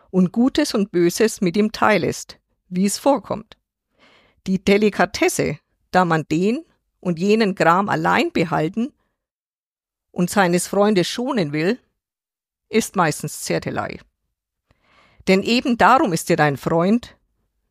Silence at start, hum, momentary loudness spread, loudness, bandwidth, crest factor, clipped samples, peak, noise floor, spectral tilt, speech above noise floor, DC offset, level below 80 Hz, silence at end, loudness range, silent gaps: 0.15 s; none; 12 LU; -19 LUFS; 15.5 kHz; 18 dB; under 0.1%; -2 dBFS; under -90 dBFS; -5 dB/octave; over 72 dB; under 0.1%; -54 dBFS; 0.6 s; 4 LU; 9.31-9.75 s